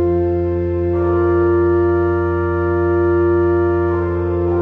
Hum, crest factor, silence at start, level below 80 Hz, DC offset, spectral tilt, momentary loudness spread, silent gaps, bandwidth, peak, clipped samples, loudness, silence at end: none; 10 dB; 0 s; -32 dBFS; under 0.1%; -11.5 dB/octave; 4 LU; none; 3.1 kHz; -6 dBFS; under 0.1%; -16 LUFS; 0 s